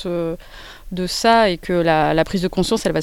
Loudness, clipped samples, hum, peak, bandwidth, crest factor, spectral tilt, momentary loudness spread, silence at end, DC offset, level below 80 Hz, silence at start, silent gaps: -18 LUFS; under 0.1%; none; -2 dBFS; 18 kHz; 16 dB; -5 dB/octave; 17 LU; 0 s; under 0.1%; -38 dBFS; 0 s; none